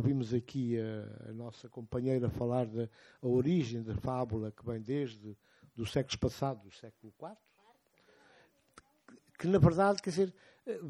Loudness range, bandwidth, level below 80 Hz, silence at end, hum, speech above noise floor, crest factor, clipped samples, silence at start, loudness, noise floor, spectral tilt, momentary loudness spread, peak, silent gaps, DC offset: 7 LU; 13 kHz; -58 dBFS; 0 s; none; 35 dB; 22 dB; under 0.1%; 0 s; -34 LUFS; -69 dBFS; -7.5 dB/octave; 20 LU; -14 dBFS; none; under 0.1%